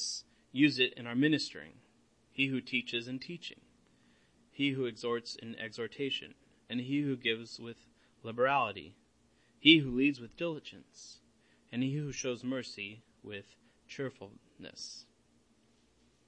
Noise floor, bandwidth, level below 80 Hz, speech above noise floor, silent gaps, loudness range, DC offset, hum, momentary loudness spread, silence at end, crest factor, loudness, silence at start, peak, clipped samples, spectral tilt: -69 dBFS; 8.8 kHz; -70 dBFS; 35 dB; none; 10 LU; under 0.1%; none; 23 LU; 1.25 s; 28 dB; -33 LUFS; 0 s; -8 dBFS; under 0.1%; -4.5 dB/octave